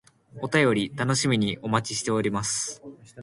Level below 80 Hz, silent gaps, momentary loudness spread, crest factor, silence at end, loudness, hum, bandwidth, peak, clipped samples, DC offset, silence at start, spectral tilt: -58 dBFS; none; 12 LU; 20 dB; 0 s; -25 LUFS; none; 11.5 kHz; -8 dBFS; under 0.1%; under 0.1%; 0.35 s; -4 dB/octave